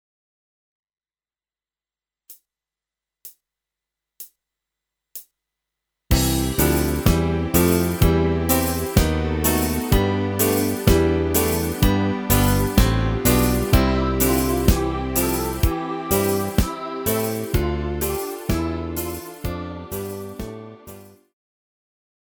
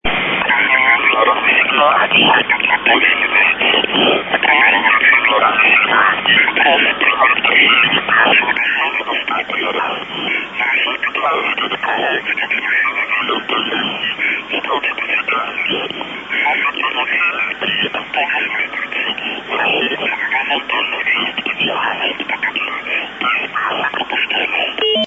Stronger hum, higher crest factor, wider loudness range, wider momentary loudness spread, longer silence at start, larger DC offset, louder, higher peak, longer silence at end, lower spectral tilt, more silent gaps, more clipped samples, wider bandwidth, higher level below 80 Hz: neither; first, 20 dB vs 14 dB; about the same, 9 LU vs 7 LU; first, 13 LU vs 9 LU; first, 2.3 s vs 0.05 s; neither; second, -21 LUFS vs -13 LUFS; about the same, -2 dBFS vs 0 dBFS; first, 1.3 s vs 0 s; about the same, -5 dB/octave vs -4.5 dB/octave; neither; neither; first, over 20 kHz vs 8 kHz; first, -28 dBFS vs -50 dBFS